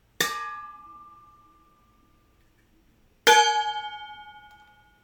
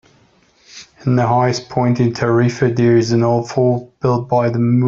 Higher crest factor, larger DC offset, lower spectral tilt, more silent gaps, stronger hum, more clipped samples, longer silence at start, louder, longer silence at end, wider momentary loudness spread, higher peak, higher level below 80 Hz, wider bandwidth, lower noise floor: first, 26 dB vs 12 dB; neither; second, 0.5 dB/octave vs -7.5 dB/octave; neither; neither; neither; second, 0.2 s vs 0.75 s; second, -22 LUFS vs -16 LUFS; first, 0.65 s vs 0 s; first, 28 LU vs 5 LU; about the same, -4 dBFS vs -2 dBFS; second, -66 dBFS vs -50 dBFS; first, 19 kHz vs 7.6 kHz; first, -62 dBFS vs -53 dBFS